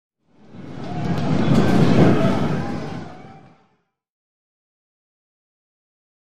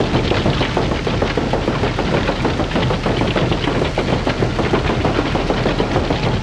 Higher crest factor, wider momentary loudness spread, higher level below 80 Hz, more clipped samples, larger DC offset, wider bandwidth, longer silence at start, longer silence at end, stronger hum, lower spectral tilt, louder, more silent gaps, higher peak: first, 20 dB vs 12 dB; first, 20 LU vs 2 LU; second, -44 dBFS vs -28 dBFS; neither; neither; first, 12.5 kHz vs 11 kHz; about the same, 0.1 s vs 0 s; first, 2.1 s vs 0 s; neither; first, -7.5 dB/octave vs -6 dB/octave; about the same, -19 LUFS vs -18 LUFS; neither; about the same, -2 dBFS vs -4 dBFS